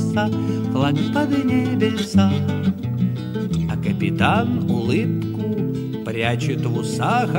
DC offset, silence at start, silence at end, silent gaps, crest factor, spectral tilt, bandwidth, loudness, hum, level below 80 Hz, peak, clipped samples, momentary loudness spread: under 0.1%; 0 s; 0 s; none; 18 dB; -7 dB/octave; 16.5 kHz; -21 LUFS; none; -48 dBFS; -2 dBFS; under 0.1%; 6 LU